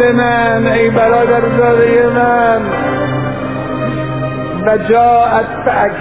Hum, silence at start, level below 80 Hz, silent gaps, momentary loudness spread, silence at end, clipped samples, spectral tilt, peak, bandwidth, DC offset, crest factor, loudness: 50 Hz at -35 dBFS; 0 s; -38 dBFS; none; 9 LU; 0 s; under 0.1%; -10.5 dB/octave; 0 dBFS; 4 kHz; 0.9%; 12 dB; -12 LUFS